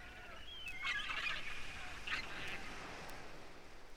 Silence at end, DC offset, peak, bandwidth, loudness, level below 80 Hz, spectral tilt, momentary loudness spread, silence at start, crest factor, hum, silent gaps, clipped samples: 0 s; under 0.1%; -28 dBFS; 16 kHz; -44 LUFS; -58 dBFS; -2 dB/octave; 14 LU; 0 s; 16 dB; none; none; under 0.1%